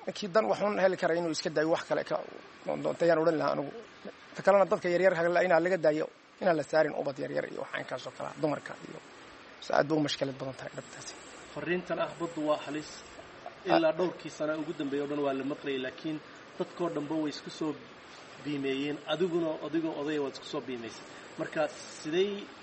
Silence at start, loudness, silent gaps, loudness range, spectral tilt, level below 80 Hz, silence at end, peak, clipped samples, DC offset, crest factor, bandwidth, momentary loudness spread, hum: 0 s; -31 LUFS; none; 7 LU; -5 dB/octave; -72 dBFS; 0 s; -8 dBFS; under 0.1%; under 0.1%; 22 dB; 8.4 kHz; 18 LU; none